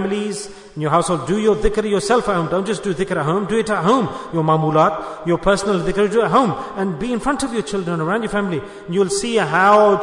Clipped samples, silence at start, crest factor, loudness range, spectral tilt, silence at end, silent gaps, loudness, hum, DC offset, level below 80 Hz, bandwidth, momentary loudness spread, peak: under 0.1%; 0 s; 16 dB; 2 LU; -5.5 dB/octave; 0 s; none; -18 LUFS; none; under 0.1%; -38 dBFS; 11 kHz; 8 LU; -2 dBFS